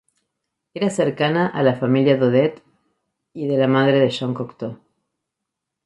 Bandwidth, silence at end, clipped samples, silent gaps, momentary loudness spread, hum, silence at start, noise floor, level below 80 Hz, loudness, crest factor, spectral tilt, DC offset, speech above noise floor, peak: 11 kHz; 1.1 s; under 0.1%; none; 14 LU; none; 0.75 s; -82 dBFS; -64 dBFS; -19 LUFS; 18 dB; -7 dB/octave; under 0.1%; 63 dB; -4 dBFS